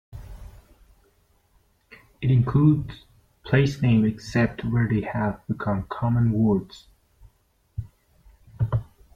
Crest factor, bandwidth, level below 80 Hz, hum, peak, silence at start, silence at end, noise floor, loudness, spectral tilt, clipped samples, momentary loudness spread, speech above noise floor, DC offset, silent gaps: 18 dB; 7.4 kHz; -46 dBFS; none; -8 dBFS; 0.15 s; 0.3 s; -65 dBFS; -23 LUFS; -8.5 dB/octave; under 0.1%; 18 LU; 43 dB; under 0.1%; none